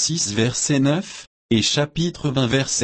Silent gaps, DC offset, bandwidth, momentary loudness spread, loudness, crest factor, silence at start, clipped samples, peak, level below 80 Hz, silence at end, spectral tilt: 1.27-1.49 s; under 0.1%; 8.8 kHz; 6 LU; -20 LUFS; 14 dB; 0 s; under 0.1%; -6 dBFS; -48 dBFS; 0 s; -4 dB/octave